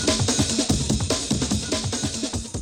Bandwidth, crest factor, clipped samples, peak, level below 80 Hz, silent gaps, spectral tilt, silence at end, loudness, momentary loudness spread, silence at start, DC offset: 17 kHz; 14 dB; under 0.1%; -10 dBFS; -36 dBFS; none; -3.5 dB/octave; 0 s; -23 LUFS; 5 LU; 0 s; under 0.1%